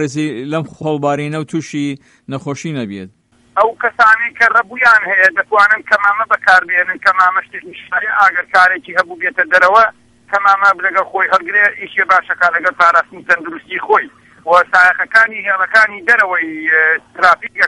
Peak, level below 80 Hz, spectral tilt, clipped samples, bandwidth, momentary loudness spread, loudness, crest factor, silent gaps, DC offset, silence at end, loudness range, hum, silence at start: 0 dBFS; -58 dBFS; -4.5 dB/octave; 0.1%; 11.5 kHz; 12 LU; -12 LUFS; 14 dB; none; under 0.1%; 0 s; 5 LU; none; 0 s